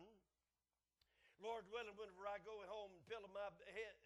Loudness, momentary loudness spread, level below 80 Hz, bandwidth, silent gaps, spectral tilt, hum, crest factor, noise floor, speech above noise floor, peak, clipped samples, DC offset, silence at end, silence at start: -53 LUFS; 5 LU; -82 dBFS; 12 kHz; none; -3.5 dB/octave; none; 18 dB; under -90 dBFS; over 36 dB; -38 dBFS; under 0.1%; under 0.1%; 0 s; 0 s